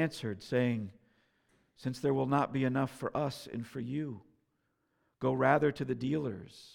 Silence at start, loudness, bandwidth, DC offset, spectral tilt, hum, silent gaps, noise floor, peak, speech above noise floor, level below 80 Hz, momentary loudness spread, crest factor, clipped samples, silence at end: 0 s; -33 LUFS; 16 kHz; under 0.1%; -7 dB/octave; none; none; -79 dBFS; -12 dBFS; 46 dB; -68 dBFS; 13 LU; 22 dB; under 0.1%; 0.05 s